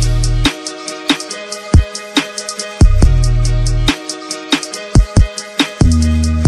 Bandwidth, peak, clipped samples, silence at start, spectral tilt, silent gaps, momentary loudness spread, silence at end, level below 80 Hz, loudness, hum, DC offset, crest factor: 13 kHz; 0 dBFS; 0.8%; 0 s; -5 dB/octave; none; 10 LU; 0 s; -16 dBFS; -15 LUFS; none; under 0.1%; 12 dB